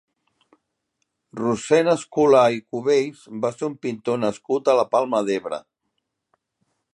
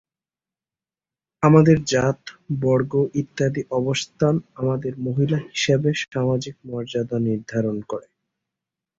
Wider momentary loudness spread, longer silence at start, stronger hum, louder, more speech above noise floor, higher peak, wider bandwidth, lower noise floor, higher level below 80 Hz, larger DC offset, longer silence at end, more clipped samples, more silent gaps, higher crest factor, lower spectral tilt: about the same, 11 LU vs 12 LU; about the same, 1.35 s vs 1.4 s; neither; about the same, -21 LUFS vs -21 LUFS; second, 56 dB vs over 69 dB; about the same, -4 dBFS vs -2 dBFS; first, 11.5 kHz vs 7.8 kHz; second, -77 dBFS vs under -90 dBFS; second, -68 dBFS vs -54 dBFS; neither; first, 1.35 s vs 1 s; neither; neither; about the same, 18 dB vs 20 dB; about the same, -5.5 dB/octave vs -6.5 dB/octave